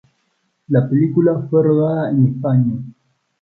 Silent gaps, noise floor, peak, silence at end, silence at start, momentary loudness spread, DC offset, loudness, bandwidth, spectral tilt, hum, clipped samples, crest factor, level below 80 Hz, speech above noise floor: none; -67 dBFS; -2 dBFS; 0.5 s; 0.7 s; 6 LU; under 0.1%; -16 LUFS; 4.1 kHz; -12.5 dB/octave; none; under 0.1%; 14 dB; -58 dBFS; 52 dB